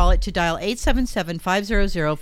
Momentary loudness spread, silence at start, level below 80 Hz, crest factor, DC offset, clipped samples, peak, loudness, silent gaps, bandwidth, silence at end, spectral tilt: 3 LU; 0 s; -24 dBFS; 14 dB; under 0.1%; under 0.1%; -6 dBFS; -22 LUFS; none; 14.5 kHz; 0 s; -5 dB/octave